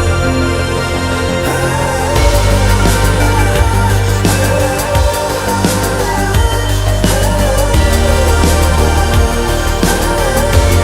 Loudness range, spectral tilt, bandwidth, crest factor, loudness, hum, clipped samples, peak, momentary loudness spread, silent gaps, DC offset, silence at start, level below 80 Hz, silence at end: 1 LU; -5 dB/octave; 16.5 kHz; 10 dB; -12 LUFS; none; under 0.1%; 0 dBFS; 3 LU; none; under 0.1%; 0 s; -16 dBFS; 0 s